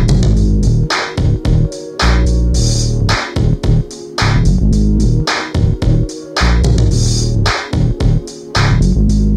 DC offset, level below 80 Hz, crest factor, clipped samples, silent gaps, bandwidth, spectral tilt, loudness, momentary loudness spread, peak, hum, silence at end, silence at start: under 0.1%; -16 dBFS; 10 dB; under 0.1%; none; 11.5 kHz; -5.5 dB/octave; -14 LUFS; 4 LU; 0 dBFS; none; 0 s; 0 s